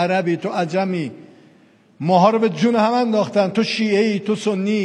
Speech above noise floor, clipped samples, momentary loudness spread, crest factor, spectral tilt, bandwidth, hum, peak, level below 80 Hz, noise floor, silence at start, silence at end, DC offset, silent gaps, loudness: 34 dB; under 0.1%; 7 LU; 16 dB; -6 dB/octave; 10 kHz; none; -2 dBFS; -70 dBFS; -52 dBFS; 0 s; 0 s; under 0.1%; none; -18 LUFS